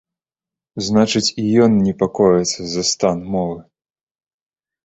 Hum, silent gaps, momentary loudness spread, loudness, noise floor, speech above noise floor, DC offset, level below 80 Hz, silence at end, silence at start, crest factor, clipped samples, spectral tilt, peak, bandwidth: none; none; 11 LU; -17 LUFS; -89 dBFS; 73 dB; under 0.1%; -50 dBFS; 1.25 s; 0.75 s; 16 dB; under 0.1%; -5 dB/octave; -2 dBFS; 8.4 kHz